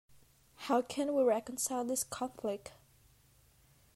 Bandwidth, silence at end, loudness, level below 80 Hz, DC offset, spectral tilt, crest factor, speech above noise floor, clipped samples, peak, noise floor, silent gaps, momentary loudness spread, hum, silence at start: 16 kHz; 1.25 s; -34 LUFS; -72 dBFS; under 0.1%; -3 dB/octave; 18 dB; 32 dB; under 0.1%; -20 dBFS; -66 dBFS; none; 12 LU; none; 0.6 s